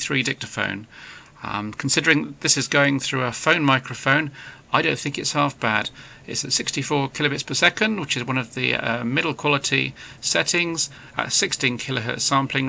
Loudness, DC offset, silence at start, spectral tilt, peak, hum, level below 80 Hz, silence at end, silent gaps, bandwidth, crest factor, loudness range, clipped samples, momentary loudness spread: -21 LUFS; under 0.1%; 0 s; -3 dB/octave; -2 dBFS; none; -58 dBFS; 0 s; none; 8 kHz; 22 dB; 2 LU; under 0.1%; 11 LU